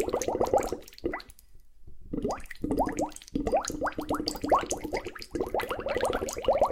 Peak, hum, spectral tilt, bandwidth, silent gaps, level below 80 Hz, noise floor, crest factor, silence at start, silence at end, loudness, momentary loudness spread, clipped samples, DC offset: -10 dBFS; none; -4 dB/octave; 16.5 kHz; none; -46 dBFS; -50 dBFS; 20 dB; 0 s; 0 s; -31 LUFS; 9 LU; under 0.1%; under 0.1%